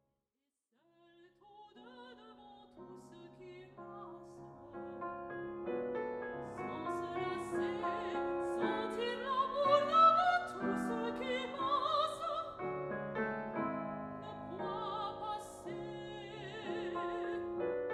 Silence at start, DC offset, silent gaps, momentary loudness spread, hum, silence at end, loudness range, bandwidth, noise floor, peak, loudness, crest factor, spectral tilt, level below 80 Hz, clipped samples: 1.2 s; under 0.1%; none; 21 LU; none; 0 s; 20 LU; 12.5 kHz; -89 dBFS; -16 dBFS; -37 LUFS; 22 dB; -5.5 dB/octave; -70 dBFS; under 0.1%